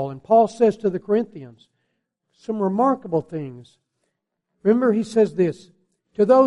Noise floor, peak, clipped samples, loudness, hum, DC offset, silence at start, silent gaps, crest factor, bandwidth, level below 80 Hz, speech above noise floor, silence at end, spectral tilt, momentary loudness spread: -77 dBFS; -4 dBFS; under 0.1%; -20 LUFS; none; under 0.1%; 0 s; none; 16 dB; 11 kHz; -66 dBFS; 57 dB; 0 s; -8 dB/octave; 18 LU